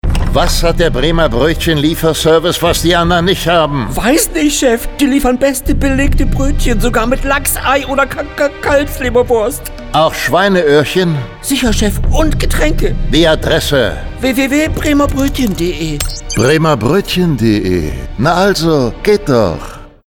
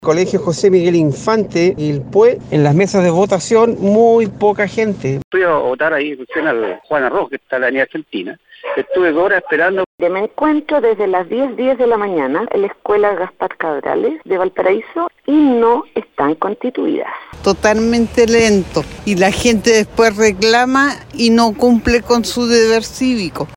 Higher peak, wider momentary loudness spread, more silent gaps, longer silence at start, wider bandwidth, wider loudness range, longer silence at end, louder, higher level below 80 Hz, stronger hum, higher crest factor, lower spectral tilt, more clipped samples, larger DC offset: about the same, 0 dBFS vs 0 dBFS; about the same, 6 LU vs 8 LU; second, none vs 5.24-5.31 s, 9.86-9.98 s; about the same, 0.05 s vs 0 s; first, 19.5 kHz vs 16.5 kHz; about the same, 2 LU vs 4 LU; first, 0.2 s vs 0 s; about the same, -12 LUFS vs -14 LUFS; first, -18 dBFS vs -42 dBFS; neither; about the same, 12 dB vs 14 dB; about the same, -4.5 dB/octave vs -5 dB/octave; neither; neither